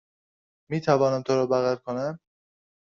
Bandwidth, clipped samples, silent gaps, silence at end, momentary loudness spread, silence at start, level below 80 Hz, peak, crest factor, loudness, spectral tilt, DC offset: 7.4 kHz; under 0.1%; none; 0.75 s; 11 LU; 0.7 s; -66 dBFS; -6 dBFS; 20 dB; -25 LUFS; -6 dB/octave; under 0.1%